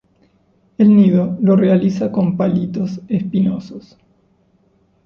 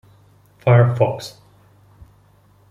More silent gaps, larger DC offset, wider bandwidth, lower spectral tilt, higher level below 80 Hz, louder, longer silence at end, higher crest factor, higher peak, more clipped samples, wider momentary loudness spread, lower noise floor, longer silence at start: neither; neither; second, 6.6 kHz vs 10.5 kHz; first, -10 dB/octave vs -7.5 dB/octave; about the same, -54 dBFS vs -54 dBFS; about the same, -15 LUFS vs -17 LUFS; second, 1.25 s vs 1.4 s; about the same, 14 dB vs 18 dB; about the same, -2 dBFS vs -2 dBFS; neither; second, 12 LU vs 18 LU; first, -57 dBFS vs -53 dBFS; first, 0.8 s vs 0.65 s